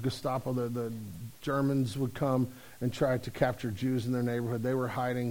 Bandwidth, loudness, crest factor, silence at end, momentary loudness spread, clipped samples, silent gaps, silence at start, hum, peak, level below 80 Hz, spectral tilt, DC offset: over 20 kHz; -32 LUFS; 18 dB; 0 s; 7 LU; under 0.1%; none; 0 s; none; -14 dBFS; -56 dBFS; -7 dB/octave; 0.1%